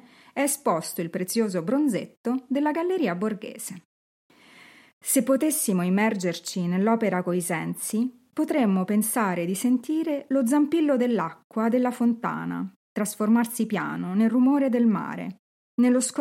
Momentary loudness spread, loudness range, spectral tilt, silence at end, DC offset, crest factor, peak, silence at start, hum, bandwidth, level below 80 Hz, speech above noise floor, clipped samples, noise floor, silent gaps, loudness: 9 LU; 3 LU; -5 dB/octave; 0 s; under 0.1%; 16 dB; -10 dBFS; 0.35 s; none; 16.5 kHz; -78 dBFS; 28 dB; under 0.1%; -52 dBFS; 2.17-2.24 s, 3.85-4.30 s, 4.93-5.01 s, 11.44-11.50 s, 12.76-12.96 s, 15.39-15.78 s; -25 LUFS